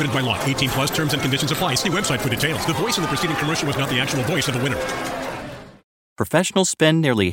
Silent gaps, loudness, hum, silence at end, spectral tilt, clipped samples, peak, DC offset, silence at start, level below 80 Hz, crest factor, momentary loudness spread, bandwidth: 5.84-6.16 s; -20 LUFS; none; 0 s; -4 dB/octave; under 0.1%; -2 dBFS; under 0.1%; 0 s; -46 dBFS; 20 dB; 9 LU; 17 kHz